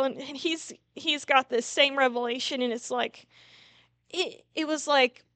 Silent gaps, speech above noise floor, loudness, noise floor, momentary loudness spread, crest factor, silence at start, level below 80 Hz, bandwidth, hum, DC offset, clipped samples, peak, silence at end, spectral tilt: none; 32 dB; -27 LUFS; -60 dBFS; 10 LU; 22 dB; 0 s; -80 dBFS; 9.4 kHz; none; under 0.1%; under 0.1%; -8 dBFS; 0.25 s; -1 dB/octave